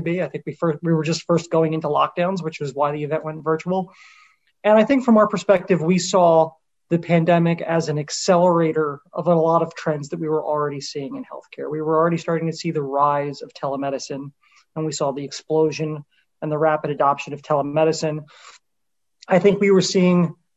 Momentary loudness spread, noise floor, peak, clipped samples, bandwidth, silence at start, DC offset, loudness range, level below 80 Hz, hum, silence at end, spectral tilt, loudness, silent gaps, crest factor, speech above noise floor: 13 LU; -82 dBFS; -4 dBFS; under 0.1%; 8.2 kHz; 0 s; under 0.1%; 6 LU; -64 dBFS; none; 0.25 s; -6 dB/octave; -20 LUFS; none; 16 dB; 62 dB